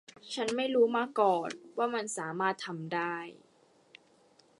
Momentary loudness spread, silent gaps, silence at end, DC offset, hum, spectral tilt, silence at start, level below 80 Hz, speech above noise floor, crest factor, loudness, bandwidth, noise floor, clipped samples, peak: 12 LU; none; 1.25 s; under 0.1%; none; -4 dB/octave; 0.25 s; -84 dBFS; 34 dB; 20 dB; -32 LUFS; 11.5 kHz; -65 dBFS; under 0.1%; -12 dBFS